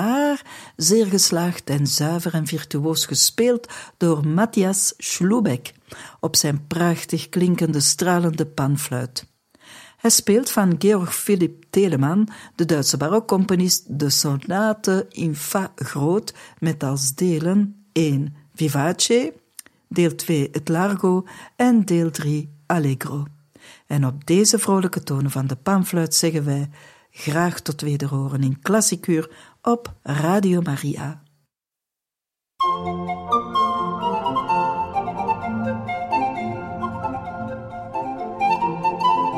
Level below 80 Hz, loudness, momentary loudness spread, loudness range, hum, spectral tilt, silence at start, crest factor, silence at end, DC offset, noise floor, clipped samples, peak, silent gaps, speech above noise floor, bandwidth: -58 dBFS; -21 LUFS; 11 LU; 5 LU; none; -4.5 dB/octave; 0 s; 20 dB; 0 s; under 0.1%; -87 dBFS; under 0.1%; -2 dBFS; none; 67 dB; 16.5 kHz